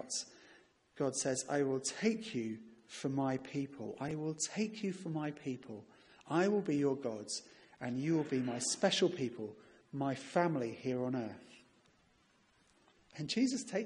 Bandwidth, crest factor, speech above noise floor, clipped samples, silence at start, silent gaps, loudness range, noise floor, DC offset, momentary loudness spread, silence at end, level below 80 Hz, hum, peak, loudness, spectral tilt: 11 kHz; 20 dB; 35 dB; under 0.1%; 0 s; none; 4 LU; -71 dBFS; under 0.1%; 14 LU; 0 s; -78 dBFS; none; -18 dBFS; -37 LUFS; -4.5 dB/octave